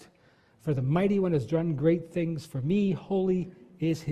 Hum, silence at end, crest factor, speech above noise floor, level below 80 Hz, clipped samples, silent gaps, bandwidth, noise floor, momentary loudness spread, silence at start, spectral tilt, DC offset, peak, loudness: none; 0 s; 16 dB; 35 dB; -60 dBFS; under 0.1%; none; 13 kHz; -62 dBFS; 7 LU; 0.65 s; -8.5 dB/octave; under 0.1%; -12 dBFS; -28 LUFS